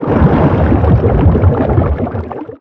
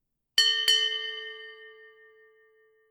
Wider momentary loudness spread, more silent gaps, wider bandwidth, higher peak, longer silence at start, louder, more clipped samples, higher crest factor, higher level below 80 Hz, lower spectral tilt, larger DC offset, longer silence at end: second, 9 LU vs 21 LU; neither; second, 4.3 kHz vs 19.5 kHz; first, 0 dBFS vs -8 dBFS; second, 0 s vs 0.35 s; first, -11 LUFS vs -23 LUFS; neither; second, 10 dB vs 22 dB; first, -18 dBFS vs -80 dBFS; first, -11.5 dB/octave vs 4.5 dB/octave; neither; second, 0.05 s vs 1.2 s